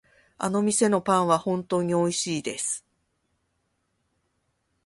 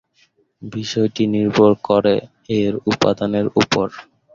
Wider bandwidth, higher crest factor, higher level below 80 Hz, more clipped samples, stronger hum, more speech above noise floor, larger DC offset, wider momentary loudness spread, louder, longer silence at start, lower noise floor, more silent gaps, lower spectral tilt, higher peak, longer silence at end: first, 11.5 kHz vs 7.6 kHz; about the same, 20 dB vs 16 dB; second, -66 dBFS vs -52 dBFS; neither; neither; first, 50 dB vs 42 dB; neither; second, 8 LU vs 11 LU; second, -25 LUFS vs -18 LUFS; second, 0.4 s vs 0.6 s; first, -74 dBFS vs -59 dBFS; neither; second, -4.5 dB/octave vs -6 dB/octave; second, -6 dBFS vs -2 dBFS; first, 2.05 s vs 0.3 s